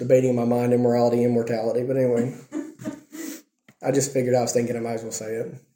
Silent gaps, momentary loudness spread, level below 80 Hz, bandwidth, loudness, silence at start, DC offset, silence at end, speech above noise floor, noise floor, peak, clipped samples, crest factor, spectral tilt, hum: none; 16 LU; -68 dBFS; 17 kHz; -23 LUFS; 0 s; under 0.1%; 0.15 s; 25 dB; -47 dBFS; -6 dBFS; under 0.1%; 16 dB; -6 dB/octave; none